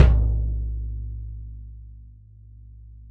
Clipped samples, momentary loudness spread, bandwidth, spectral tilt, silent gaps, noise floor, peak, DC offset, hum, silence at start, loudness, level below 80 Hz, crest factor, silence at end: under 0.1%; 25 LU; 4.2 kHz; -9 dB/octave; none; -46 dBFS; -2 dBFS; under 0.1%; none; 0 s; -27 LUFS; -26 dBFS; 22 dB; 0 s